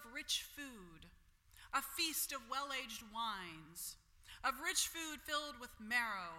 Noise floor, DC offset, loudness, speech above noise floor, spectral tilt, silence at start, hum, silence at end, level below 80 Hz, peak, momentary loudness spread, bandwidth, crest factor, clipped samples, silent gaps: -67 dBFS; under 0.1%; -41 LUFS; 24 dB; 0 dB/octave; 0 s; none; 0 s; -68 dBFS; -22 dBFS; 15 LU; 16.5 kHz; 22 dB; under 0.1%; none